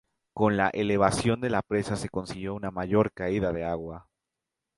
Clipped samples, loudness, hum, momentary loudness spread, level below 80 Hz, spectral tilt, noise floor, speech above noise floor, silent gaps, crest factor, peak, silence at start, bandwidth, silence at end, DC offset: under 0.1%; -28 LUFS; none; 11 LU; -50 dBFS; -6 dB/octave; -87 dBFS; 60 dB; none; 22 dB; -6 dBFS; 0.35 s; 11.5 kHz; 0.75 s; under 0.1%